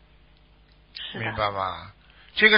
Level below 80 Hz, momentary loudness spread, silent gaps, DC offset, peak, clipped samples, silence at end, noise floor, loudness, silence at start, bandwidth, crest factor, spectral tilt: -52 dBFS; 17 LU; none; under 0.1%; -4 dBFS; under 0.1%; 0 s; -56 dBFS; -27 LUFS; 0.95 s; 5.4 kHz; 22 dB; -8 dB/octave